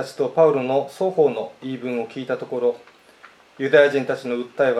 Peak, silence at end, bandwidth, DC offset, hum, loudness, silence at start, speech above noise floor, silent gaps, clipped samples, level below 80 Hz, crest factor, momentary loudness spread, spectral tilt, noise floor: 0 dBFS; 0 s; 12 kHz; under 0.1%; none; -21 LUFS; 0 s; 29 dB; none; under 0.1%; -76 dBFS; 20 dB; 13 LU; -6 dB/octave; -49 dBFS